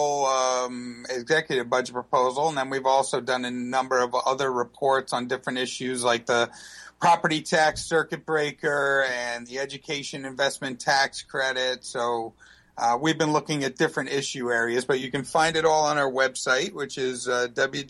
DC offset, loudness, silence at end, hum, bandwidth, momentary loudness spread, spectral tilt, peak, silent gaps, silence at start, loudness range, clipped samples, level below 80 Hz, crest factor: under 0.1%; -25 LUFS; 0 s; none; 12.5 kHz; 8 LU; -3 dB/octave; -10 dBFS; none; 0 s; 2 LU; under 0.1%; -62 dBFS; 16 dB